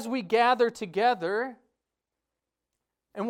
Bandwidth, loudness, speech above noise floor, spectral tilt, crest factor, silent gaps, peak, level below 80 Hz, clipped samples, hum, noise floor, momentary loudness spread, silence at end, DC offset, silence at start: 14.5 kHz; -26 LUFS; 61 dB; -4.5 dB/octave; 18 dB; none; -10 dBFS; -76 dBFS; under 0.1%; none; -87 dBFS; 11 LU; 0 s; under 0.1%; 0 s